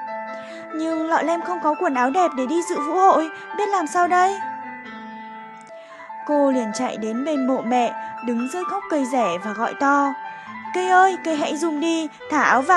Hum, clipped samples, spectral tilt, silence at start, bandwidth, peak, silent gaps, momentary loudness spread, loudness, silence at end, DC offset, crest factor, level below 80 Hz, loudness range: none; under 0.1%; -3.5 dB/octave; 0 s; 12 kHz; -2 dBFS; none; 17 LU; -21 LUFS; 0 s; under 0.1%; 20 dB; -74 dBFS; 4 LU